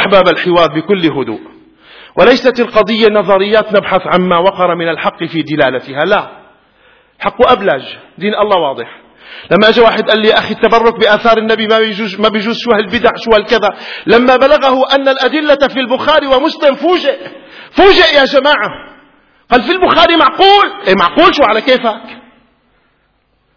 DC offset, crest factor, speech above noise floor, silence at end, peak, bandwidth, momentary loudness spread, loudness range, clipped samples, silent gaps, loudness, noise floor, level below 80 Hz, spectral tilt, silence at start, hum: 0.2%; 10 dB; 48 dB; 1.35 s; 0 dBFS; 5.4 kHz; 11 LU; 5 LU; 0.8%; none; -10 LUFS; -57 dBFS; -40 dBFS; -5.5 dB/octave; 0 s; none